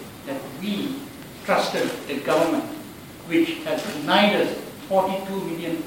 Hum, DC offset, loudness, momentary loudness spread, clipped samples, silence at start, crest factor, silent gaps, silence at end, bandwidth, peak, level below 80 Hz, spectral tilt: none; under 0.1%; -24 LUFS; 15 LU; under 0.1%; 0 s; 22 dB; none; 0 s; 17 kHz; -4 dBFS; -60 dBFS; -4.5 dB/octave